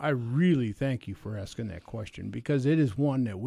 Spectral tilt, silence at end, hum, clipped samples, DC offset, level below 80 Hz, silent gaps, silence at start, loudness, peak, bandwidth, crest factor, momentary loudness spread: -8 dB/octave; 0 s; none; under 0.1%; under 0.1%; -54 dBFS; none; 0 s; -29 LUFS; -14 dBFS; 11.5 kHz; 14 dB; 13 LU